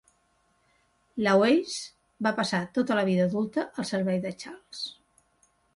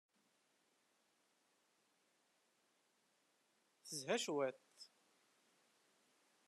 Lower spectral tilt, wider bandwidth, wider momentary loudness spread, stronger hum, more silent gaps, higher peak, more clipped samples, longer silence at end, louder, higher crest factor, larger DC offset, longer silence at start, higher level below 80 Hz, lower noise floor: first, -5.5 dB/octave vs -2.5 dB/octave; about the same, 11.5 kHz vs 12.5 kHz; second, 15 LU vs 22 LU; neither; neither; first, -10 dBFS vs -26 dBFS; neither; second, 0.85 s vs 1.6 s; first, -27 LUFS vs -43 LUFS; second, 18 dB vs 26 dB; neither; second, 1.15 s vs 3.85 s; first, -68 dBFS vs under -90 dBFS; second, -69 dBFS vs -81 dBFS